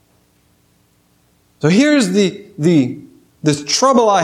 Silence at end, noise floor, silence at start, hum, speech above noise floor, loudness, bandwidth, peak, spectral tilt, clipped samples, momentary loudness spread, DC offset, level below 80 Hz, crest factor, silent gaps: 0 s; -57 dBFS; 1.6 s; none; 44 dB; -14 LUFS; 13.5 kHz; 0 dBFS; -5 dB/octave; under 0.1%; 9 LU; under 0.1%; -64 dBFS; 16 dB; none